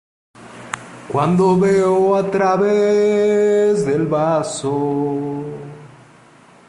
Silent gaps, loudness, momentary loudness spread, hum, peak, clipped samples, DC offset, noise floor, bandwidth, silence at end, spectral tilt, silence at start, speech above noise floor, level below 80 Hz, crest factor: none; -16 LUFS; 16 LU; none; -4 dBFS; under 0.1%; under 0.1%; -47 dBFS; 11.5 kHz; 0.8 s; -6.5 dB/octave; 0.4 s; 31 dB; -56 dBFS; 14 dB